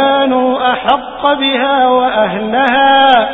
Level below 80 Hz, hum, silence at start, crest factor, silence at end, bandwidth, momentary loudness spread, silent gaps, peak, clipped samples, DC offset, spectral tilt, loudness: -46 dBFS; none; 0 s; 10 dB; 0 s; 4 kHz; 6 LU; none; 0 dBFS; under 0.1%; under 0.1%; -6 dB/octave; -11 LUFS